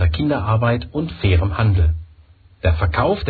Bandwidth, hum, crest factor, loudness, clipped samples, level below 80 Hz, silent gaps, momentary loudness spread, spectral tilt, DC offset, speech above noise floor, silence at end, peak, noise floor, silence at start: 4.8 kHz; none; 14 dB; -19 LUFS; under 0.1%; -26 dBFS; none; 6 LU; -10.5 dB/octave; under 0.1%; 31 dB; 0 s; -4 dBFS; -48 dBFS; 0 s